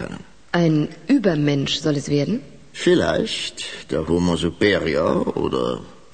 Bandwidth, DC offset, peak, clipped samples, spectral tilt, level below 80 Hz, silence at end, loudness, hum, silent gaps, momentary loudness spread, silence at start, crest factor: 9.4 kHz; 0.5%; -4 dBFS; under 0.1%; -5.5 dB/octave; -46 dBFS; 0.25 s; -21 LUFS; none; none; 10 LU; 0 s; 16 dB